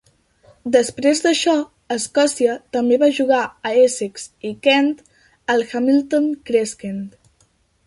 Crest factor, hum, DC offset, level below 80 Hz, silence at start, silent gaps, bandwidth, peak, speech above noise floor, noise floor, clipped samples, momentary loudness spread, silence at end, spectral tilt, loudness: 16 dB; none; under 0.1%; -62 dBFS; 0.65 s; none; 11.5 kHz; -2 dBFS; 43 dB; -60 dBFS; under 0.1%; 14 LU; 0.75 s; -3 dB/octave; -18 LUFS